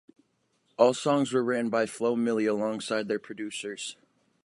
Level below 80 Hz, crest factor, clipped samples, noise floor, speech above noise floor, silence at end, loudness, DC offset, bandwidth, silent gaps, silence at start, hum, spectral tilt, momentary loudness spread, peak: -78 dBFS; 22 dB; under 0.1%; -72 dBFS; 45 dB; 0.5 s; -28 LUFS; under 0.1%; 11.5 kHz; none; 0.8 s; none; -4.5 dB/octave; 12 LU; -6 dBFS